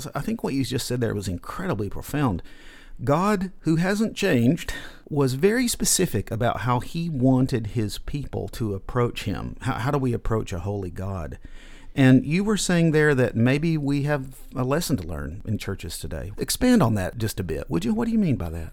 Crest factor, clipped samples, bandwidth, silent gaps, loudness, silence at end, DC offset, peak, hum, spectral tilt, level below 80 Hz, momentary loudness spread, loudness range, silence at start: 20 dB; under 0.1%; 18.5 kHz; none; -24 LUFS; 0 s; under 0.1%; -4 dBFS; none; -5.5 dB/octave; -40 dBFS; 12 LU; 6 LU; 0 s